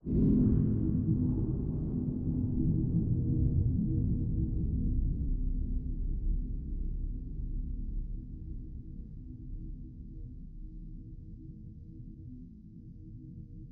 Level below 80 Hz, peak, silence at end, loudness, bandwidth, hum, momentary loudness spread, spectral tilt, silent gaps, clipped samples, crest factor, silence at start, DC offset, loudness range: -36 dBFS; -16 dBFS; 0 s; -33 LUFS; 1.5 kHz; none; 19 LU; -15.5 dB/octave; none; under 0.1%; 16 dB; 0.05 s; under 0.1%; 17 LU